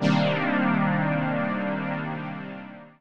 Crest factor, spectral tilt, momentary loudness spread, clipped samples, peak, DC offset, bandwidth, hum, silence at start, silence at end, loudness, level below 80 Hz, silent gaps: 16 dB; -7.5 dB/octave; 14 LU; under 0.1%; -10 dBFS; 0.4%; 7.8 kHz; none; 0 s; 0 s; -25 LUFS; -62 dBFS; none